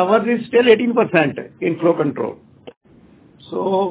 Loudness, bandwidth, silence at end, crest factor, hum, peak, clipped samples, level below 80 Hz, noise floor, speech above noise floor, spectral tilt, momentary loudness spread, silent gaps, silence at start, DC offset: -17 LUFS; 4 kHz; 0 s; 18 dB; none; 0 dBFS; under 0.1%; -60 dBFS; -48 dBFS; 32 dB; -10 dB/octave; 12 LU; 2.77-2.81 s; 0 s; under 0.1%